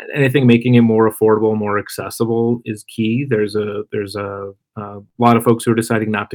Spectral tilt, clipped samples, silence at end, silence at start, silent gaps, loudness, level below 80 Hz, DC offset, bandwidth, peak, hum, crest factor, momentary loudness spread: -7 dB/octave; under 0.1%; 0 s; 0 s; none; -16 LUFS; -62 dBFS; under 0.1%; 19 kHz; 0 dBFS; none; 16 dB; 15 LU